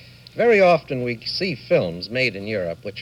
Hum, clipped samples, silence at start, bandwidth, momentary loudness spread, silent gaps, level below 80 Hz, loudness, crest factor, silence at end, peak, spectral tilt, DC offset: none; under 0.1%; 0.35 s; 12 kHz; 11 LU; none; -54 dBFS; -21 LUFS; 16 dB; 0 s; -4 dBFS; -6 dB/octave; under 0.1%